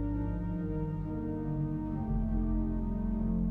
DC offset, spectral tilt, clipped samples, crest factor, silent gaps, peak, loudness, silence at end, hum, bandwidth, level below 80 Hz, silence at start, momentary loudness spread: under 0.1%; -12 dB/octave; under 0.1%; 10 dB; none; -22 dBFS; -34 LUFS; 0 s; none; 3 kHz; -36 dBFS; 0 s; 3 LU